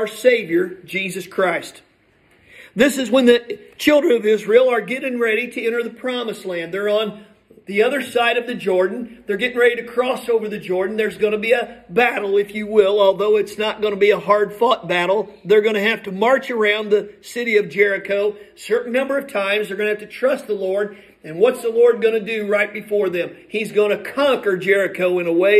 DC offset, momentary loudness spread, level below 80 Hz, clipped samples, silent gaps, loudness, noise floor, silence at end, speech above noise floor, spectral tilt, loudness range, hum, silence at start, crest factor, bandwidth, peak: under 0.1%; 9 LU; -62 dBFS; under 0.1%; none; -18 LUFS; -56 dBFS; 0 s; 38 dB; -4.5 dB/octave; 4 LU; none; 0 s; 18 dB; 14.5 kHz; 0 dBFS